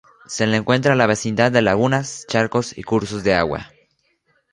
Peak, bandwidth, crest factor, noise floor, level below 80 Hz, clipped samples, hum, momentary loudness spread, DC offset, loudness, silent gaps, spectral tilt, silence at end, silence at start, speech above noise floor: -2 dBFS; 11.5 kHz; 18 dB; -65 dBFS; -48 dBFS; under 0.1%; none; 7 LU; under 0.1%; -19 LUFS; none; -5 dB/octave; 0.85 s; 0.3 s; 47 dB